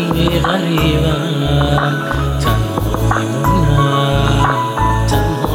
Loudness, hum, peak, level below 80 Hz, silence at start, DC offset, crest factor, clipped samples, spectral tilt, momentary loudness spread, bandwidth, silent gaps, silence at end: -15 LUFS; none; 0 dBFS; -24 dBFS; 0 s; under 0.1%; 14 dB; under 0.1%; -6 dB/octave; 4 LU; 17 kHz; none; 0 s